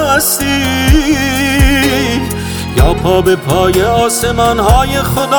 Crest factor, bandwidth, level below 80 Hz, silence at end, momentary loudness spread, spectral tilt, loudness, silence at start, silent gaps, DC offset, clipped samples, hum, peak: 10 dB; over 20 kHz; -18 dBFS; 0 s; 4 LU; -4.5 dB/octave; -11 LUFS; 0 s; none; under 0.1%; under 0.1%; none; 0 dBFS